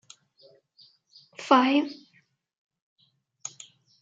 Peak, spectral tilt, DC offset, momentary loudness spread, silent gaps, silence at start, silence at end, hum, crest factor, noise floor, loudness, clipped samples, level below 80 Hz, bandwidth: -4 dBFS; -2.5 dB/octave; under 0.1%; 28 LU; 2.58-2.69 s, 2.82-2.96 s; 1.4 s; 0.55 s; none; 26 dB; -66 dBFS; -23 LUFS; under 0.1%; -86 dBFS; 7.8 kHz